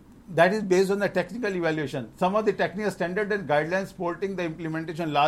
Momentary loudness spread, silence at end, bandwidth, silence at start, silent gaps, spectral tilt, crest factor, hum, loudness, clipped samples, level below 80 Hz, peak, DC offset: 9 LU; 0 s; 14.5 kHz; 0.1 s; none; -6 dB/octave; 20 dB; none; -26 LUFS; under 0.1%; -58 dBFS; -6 dBFS; under 0.1%